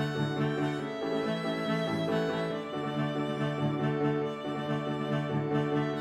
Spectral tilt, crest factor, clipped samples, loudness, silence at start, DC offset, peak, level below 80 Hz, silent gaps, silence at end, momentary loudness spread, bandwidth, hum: -7 dB/octave; 14 dB; under 0.1%; -31 LUFS; 0 s; under 0.1%; -16 dBFS; -66 dBFS; none; 0 s; 4 LU; 12 kHz; none